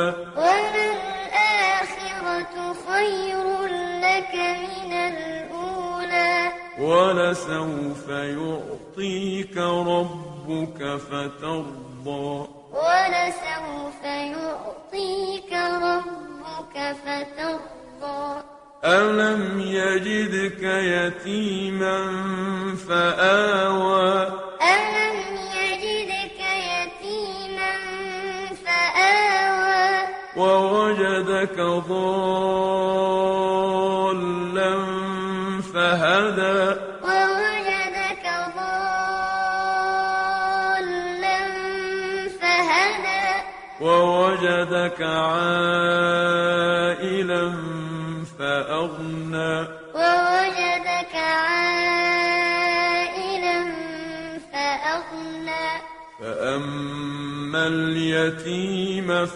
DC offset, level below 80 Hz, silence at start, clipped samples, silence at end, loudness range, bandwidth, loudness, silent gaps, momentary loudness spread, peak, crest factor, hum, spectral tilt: under 0.1%; -58 dBFS; 0 s; under 0.1%; 0 s; 7 LU; 11 kHz; -22 LUFS; none; 11 LU; -4 dBFS; 20 dB; none; -4.5 dB/octave